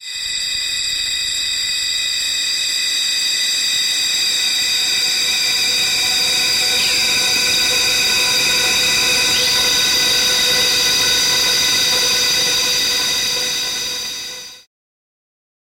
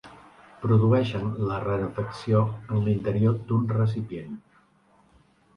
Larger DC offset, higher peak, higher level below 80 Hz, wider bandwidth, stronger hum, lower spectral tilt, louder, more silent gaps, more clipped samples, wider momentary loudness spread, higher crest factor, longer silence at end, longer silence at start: neither; about the same, -8 dBFS vs -10 dBFS; about the same, -48 dBFS vs -52 dBFS; first, 16.5 kHz vs 6.4 kHz; neither; second, 1 dB/octave vs -9.5 dB/octave; first, -14 LUFS vs -25 LUFS; neither; neither; second, 5 LU vs 11 LU; second, 10 dB vs 16 dB; about the same, 1.05 s vs 1.15 s; about the same, 0 s vs 0.05 s